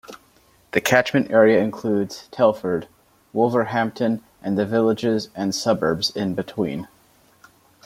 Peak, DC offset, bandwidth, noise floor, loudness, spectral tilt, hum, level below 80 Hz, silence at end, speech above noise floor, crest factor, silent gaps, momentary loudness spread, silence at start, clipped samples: 0 dBFS; under 0.1%; 16.5 kHz; -57 dBFS; -21 LUFS; -5 dB/octave; none; -60 dBFS; 1 s; 36 dB; 22 dB; none; 10 LU; 0.1 s; under 0.1%